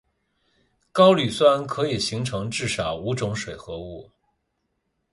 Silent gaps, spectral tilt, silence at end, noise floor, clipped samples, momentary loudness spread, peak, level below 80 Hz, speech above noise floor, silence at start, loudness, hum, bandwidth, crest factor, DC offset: none; -5 dB/octave; 1.1 s; -75 dBFS; under 0.1%; 18 LU; -4 dBFS; -52 dBFS; 53 dB; 0.95 s; -22 LUFS; none; 11.5 kHz; 20 dB; under 0.1%